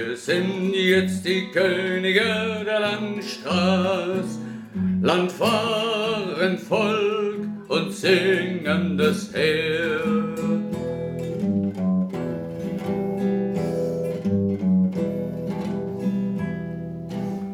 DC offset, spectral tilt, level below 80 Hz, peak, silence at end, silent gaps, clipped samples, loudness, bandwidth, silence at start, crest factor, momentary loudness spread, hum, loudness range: under 0.1%; -6 dB/octave; -58 dBFS; -6 dBFS; 0 s; none; under 0.1%; -23 LUFS; 15 kHz; 0 s; 18 dB; 9 LU; none; 3 LU